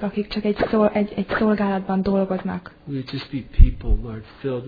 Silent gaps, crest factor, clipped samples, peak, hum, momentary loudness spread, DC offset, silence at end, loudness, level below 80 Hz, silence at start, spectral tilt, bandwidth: none; 20 dB; under 0.1%; 0 dBFS; none; 12 LU; under 0.1%; 0 s; -23 LUFS; -24 dBFS; 0 s; -9.5 dB/octave; 5 kHz